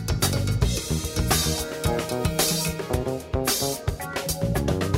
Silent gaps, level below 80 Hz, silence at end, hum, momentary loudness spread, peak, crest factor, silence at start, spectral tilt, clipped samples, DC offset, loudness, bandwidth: none; -34 dBFS; 0 s; none; 6 LU; -6 dBFS; 18 dB; 0 s; -4 dB/octave; under 0.1%; under 0.1%; -25 LUFS; 16.5 kHz